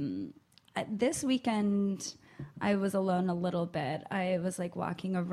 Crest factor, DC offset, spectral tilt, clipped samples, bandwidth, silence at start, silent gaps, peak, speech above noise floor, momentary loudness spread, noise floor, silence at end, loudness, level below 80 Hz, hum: 14 dB; under 0.1%; -5.5 dB/octave; under 0.1%; 14 kHz; 0 s; none; -18 dBFS; 22 dB; 11 LU; -54 dBFS; 0 s; -33 LUFS; -68 dBFS; none